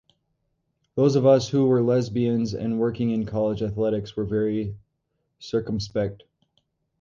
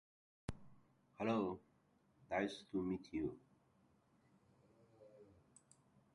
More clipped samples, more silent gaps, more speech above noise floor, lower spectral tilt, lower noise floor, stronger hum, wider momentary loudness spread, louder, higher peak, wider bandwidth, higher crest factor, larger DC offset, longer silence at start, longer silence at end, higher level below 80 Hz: neither; neither; first, 53 dB vs 34 dB; about the same, -7.5 dB/octave vs -6.5 dB/octave; about the same, -76 dBFS vs -76 dBFS; neither; second, 11 LU vs 18 LU; first, -24 LUFS vs -44 LUFS; first, -6 dBFS vs -26 dBFS; second, 7.4 kHz vs 11 kHz; about the same, 18 dB vs 22 dB; neither; first, 0.95 s vs 0.5 s; about the same, 0.85 s vs 0.9 s; first, -52 dBFS vs -70 dBFS